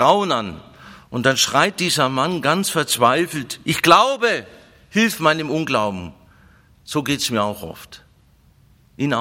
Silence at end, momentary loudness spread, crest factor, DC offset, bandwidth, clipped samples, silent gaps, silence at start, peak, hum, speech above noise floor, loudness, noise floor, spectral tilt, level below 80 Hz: 0 s; 15 LU; 20 dB; under 0.1%; 16.5 kHz; under 0.1%; none; 0 s; 0 dBFS; none; 35 dB; -18 LUFS; -54 dBFS; -3.5 dB/octave; -56 dBFS